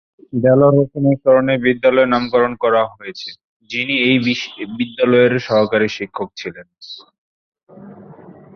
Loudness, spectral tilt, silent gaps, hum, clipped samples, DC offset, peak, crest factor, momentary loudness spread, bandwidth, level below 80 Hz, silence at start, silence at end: -16 LUFS; -7 dB/octave; 3.44-3.60 s, 7.18-7.52 s, 7.63-7.67 s; none; under 0.1%; under 0.1%; -2 dBFS; 16 dB; 18 LU; 6.6 kHz; -54 dBFS; 0.35 s; 0.25 s